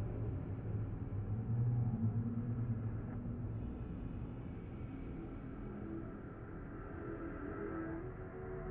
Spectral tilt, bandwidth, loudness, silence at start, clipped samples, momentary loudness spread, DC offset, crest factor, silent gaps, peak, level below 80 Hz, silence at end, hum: -10.5 dB/octave; 3.2 kHz; -43 LUFS; 0 s; under 0.1%; 11 LU; under 0.1%; 16 dB; none; -26 dBFS; -52 dBFS; 0 s; none